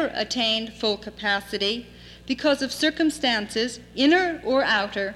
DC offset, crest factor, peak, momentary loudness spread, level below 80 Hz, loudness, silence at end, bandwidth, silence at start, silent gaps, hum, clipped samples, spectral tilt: under 0.1%; 16 dB; -8 dBFS; 7 LU; -54 dBFS; -23 LUFS; 0 s; 14 kHz; 0 s; none; 60 Hz at -55 dBFS; under 0.1%; -3 dB/octave